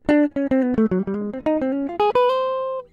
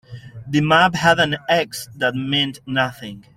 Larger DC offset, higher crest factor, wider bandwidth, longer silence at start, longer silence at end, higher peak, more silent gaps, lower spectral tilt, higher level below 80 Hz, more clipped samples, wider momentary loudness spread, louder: neither; about the same, 14 dB vs 18 dB; second, 7.2 kHz vs 16 kHz; about the same, 0.1 s vs 0.1 s; about the same, 0.1 s vs 0.15 s; second, -6 dBFS vs -2 dBFS; neither; first, -8 dB/octave vs -4.5 dB/octave; about the same, -50 dBFS vs -52 dBFS; neither; second, 6 LU vs 14 LU; second, -21 LUFS vs -18 LUFS